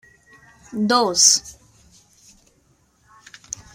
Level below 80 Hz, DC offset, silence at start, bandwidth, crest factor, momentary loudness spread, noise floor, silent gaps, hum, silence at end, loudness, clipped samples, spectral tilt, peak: -58 dBFS; under 0.1%; 0.7 s; 16 kHz; 24 dB; 22 LU; -61 dBFS; none; none; 2.25 s; -16 LUFS; under 0.1%; -1 dB/octave; 0 dBFS